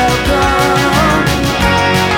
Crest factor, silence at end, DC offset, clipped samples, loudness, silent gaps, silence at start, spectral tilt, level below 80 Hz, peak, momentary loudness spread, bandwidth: 10 dB; 0 s; under 0.1%; under 0.1%; -11 LUFS; none; 0 s; -4.5 dB/octave; -24 dBFS; 0 dBFS; 2 LU; 19 kHz